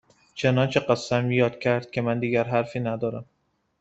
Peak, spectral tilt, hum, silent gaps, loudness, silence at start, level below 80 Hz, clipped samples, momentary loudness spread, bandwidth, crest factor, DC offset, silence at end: -6 dBFS; -6.5 dB/octave; none; none; -24 LUFS; 0.35 s; -60 dBFS; under 0.1%; 7 LU; 8 kHz; 20 dB; under 0.1%; 0.6 s